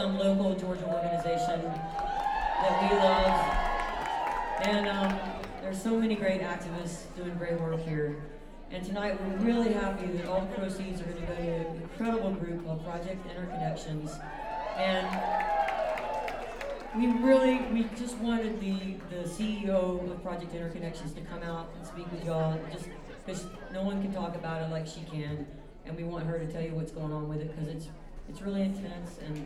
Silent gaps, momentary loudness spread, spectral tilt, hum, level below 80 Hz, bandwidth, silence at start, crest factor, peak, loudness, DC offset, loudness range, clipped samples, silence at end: none; 13 LU; -6.5 dB/octave; none; -46 dBFS; 14 kHz; 0 s; 20 dB; -12 dBFS; -32 LUFS; under 0.1%; 8 LU; under 0.1%; 0 s